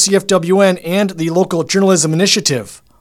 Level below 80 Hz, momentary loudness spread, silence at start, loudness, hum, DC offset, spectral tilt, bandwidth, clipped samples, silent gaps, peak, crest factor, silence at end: -54 dBFS; 6 LU; 0 s; -13 LUFS; none; under 0.1%; -4 dB/octave; 16 kHz; under 0.1%; none; 0 dBFS; 14 dB; 0.25 s